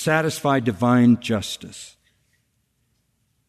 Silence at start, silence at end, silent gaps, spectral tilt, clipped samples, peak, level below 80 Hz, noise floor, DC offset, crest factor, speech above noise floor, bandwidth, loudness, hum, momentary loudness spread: 0 s; 1.6 s; none; -5.5 dB/octave; under 0.1%; -6 dBFS; -60 dBFS; -69 dBFS; under 0.1%; 16 dB; 49 dB; 13.5 kHz; -20 LUFS; none; 22 LU